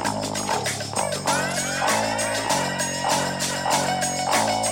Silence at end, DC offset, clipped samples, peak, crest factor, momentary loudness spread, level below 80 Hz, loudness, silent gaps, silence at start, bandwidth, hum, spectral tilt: 0 s; under 0.1%; under 0.1%; -8 dBFS; 16 dB; 4 LU; -54 dBFS; -23 LUFS; none; 0 s; 17 kHz; none; -2.5 dB/octave